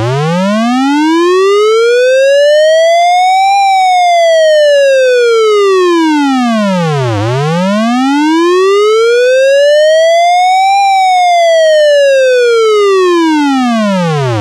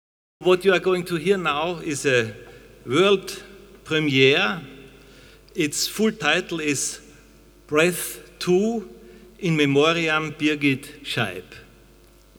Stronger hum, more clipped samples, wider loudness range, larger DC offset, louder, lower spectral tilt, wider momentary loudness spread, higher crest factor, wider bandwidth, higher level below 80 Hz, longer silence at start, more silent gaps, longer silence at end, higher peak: neither; neither; about the same, 3 LU vs 2 LU; neither; first, -8 LUFS vs -22 LUFS; about the same, -5 dB/octave vs -4 dB/octave; second, 5 LU vs 14 LU; second, 4 dB vs 22 dB; second, 13.5 kHz vs over 20 kHz; about the same, -54 dBFS vs -54 dBFS; second, 0 s vs 0.4 s; neither; second, 0 s vs 0.8 s; about the same, -2 dBFS vs -2 dBFS